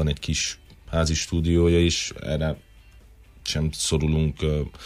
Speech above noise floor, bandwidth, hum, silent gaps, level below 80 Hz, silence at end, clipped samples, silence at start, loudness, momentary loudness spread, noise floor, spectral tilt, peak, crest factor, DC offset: 26 dB; 15 kHz; none; none; -34 dBFS; 0 s; under 0.1%; 0 s; -24 LUFS; 10 LU; -50 dBFS; -5 dB/octave; -10 dBFS; 14 dB; under 0.1%